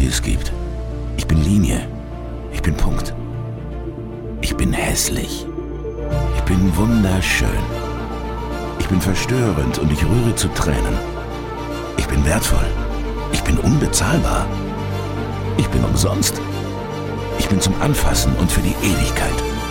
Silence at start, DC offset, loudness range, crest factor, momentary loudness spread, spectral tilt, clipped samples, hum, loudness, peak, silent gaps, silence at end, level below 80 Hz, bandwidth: 0 s; under 0.1%; 3 LU; 16 dB; 11 LU; -5 dB/octave; under 0.1%; none; -20 LUFS; -2 dBFS; none; 0 s; -24 dBFS; 17 kHz